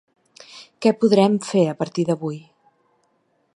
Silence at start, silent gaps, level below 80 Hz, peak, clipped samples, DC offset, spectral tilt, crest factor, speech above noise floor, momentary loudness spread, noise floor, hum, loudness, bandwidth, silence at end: 0.55 s; none; -68 dBFS; -2 dBFS; under 0.1%; under 0.1%; -6.5 dB/octave; 20 dB; 48 dB; 24 LU; -66 dBFS; none; -20 LUFS; 11 kHz; 1.15 s